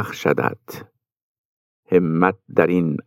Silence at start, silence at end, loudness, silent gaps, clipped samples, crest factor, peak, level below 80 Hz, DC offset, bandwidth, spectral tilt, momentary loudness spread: 0 s; 0.05 s; -19 LUFS; 1.22-1.83 s; under 0.1%; 20 dB; -2 dBFS; -64 dBFS; under 0.1%; 16.5 kHz; -7.5 dB/octave; 19 LU